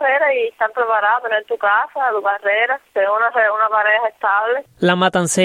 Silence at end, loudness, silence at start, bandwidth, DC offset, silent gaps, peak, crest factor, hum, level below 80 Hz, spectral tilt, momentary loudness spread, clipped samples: 0 s; -17 LUFS; 0 s; 16 kHz; under 0.1%; none; -2 dBFS; 16 dB; none; -64 dBFS; -3.5 dB/octave; 4 LU; under 0.1%